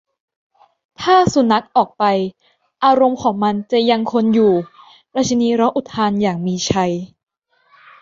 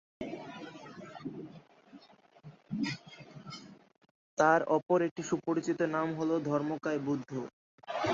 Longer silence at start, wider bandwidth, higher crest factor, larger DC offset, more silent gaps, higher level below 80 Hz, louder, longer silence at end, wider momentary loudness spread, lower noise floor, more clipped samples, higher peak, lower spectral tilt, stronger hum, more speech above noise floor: first, 1 s vs 0.2 s; about the same, 7.6 kHz vs 7.6 kHz; second, 16 dB vs 22 dB; neither; second, none vs 4.11-4.37 s, 5.11-5.16 s, 7.53-7.78 s; first, -52 dBFS vs -72 dBFS; first, -16 LUFS vs -33 LUFS; first, 0.95 s vs 0 s; second, 8 LU vs 19 LU; about the same, -56 dBFS vs -59 dBFS; neither; first, -2 dBFS vs -12 dBFS; about the same, -5.5 dB/octave vs -6 dB/octave; neither; first, 41 dB vs 28 dB